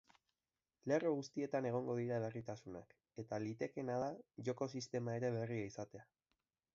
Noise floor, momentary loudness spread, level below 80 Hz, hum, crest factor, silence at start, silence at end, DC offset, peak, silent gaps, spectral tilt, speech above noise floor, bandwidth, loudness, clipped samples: under -90 dBFS; 13 LU; -78 dBFS; none; 18 dB; 0.85 s; 0.7 s; under 0.1%; -24 dBFS; none; -6.5 dB/octave; over 48 dB; 7.4 kHz; -43 LUFS; under 0.1%